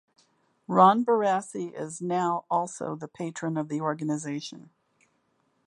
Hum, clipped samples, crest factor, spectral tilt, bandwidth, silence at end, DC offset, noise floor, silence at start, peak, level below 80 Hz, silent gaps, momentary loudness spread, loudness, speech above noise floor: none; under 0.1%; 22 dB; -6 dB/octave; 11.5 kHz; 1.05 s; under 0.1%; -71 dBFS; 0.7 s; -6 dBFS; -78 dBFS; none; 16 LU; -27 LUFS; 45 dB